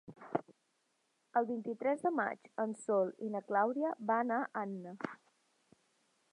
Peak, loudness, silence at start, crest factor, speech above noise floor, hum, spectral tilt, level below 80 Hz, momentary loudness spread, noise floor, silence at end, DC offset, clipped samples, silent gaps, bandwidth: -16 dBFS; -37 LUFS; 0.1 s; 22 dB; 43 dB; none; -7 dB/octave; -88 dBFS; 9 LU; -79 dBFS; 1.15 s; under 0.1%; under 0.1%; none; 11 kHz